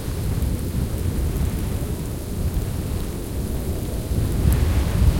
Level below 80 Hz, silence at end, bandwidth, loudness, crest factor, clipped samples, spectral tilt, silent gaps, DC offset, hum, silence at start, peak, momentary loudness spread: -26 dBFS; 0 s; 17 kHz; -25 LUFS; 16 dB; under 0.1%; -6.5 dB/octave; none; under 0.1%; none; 0 s; -6 dBFS; 7 LU